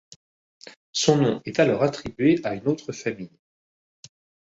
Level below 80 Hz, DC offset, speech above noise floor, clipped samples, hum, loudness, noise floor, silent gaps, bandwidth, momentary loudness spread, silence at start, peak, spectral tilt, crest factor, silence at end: -60 dBFS; under 0.1%; over 67 dB; under 0.1%; none; -23 LUFS; under -90 dBFS; 0.76-0.93 s; 8 kHz; 11 LU; 0.65 s; -4 dBFS; -5 dB/octave; 22 dB; 1.15 s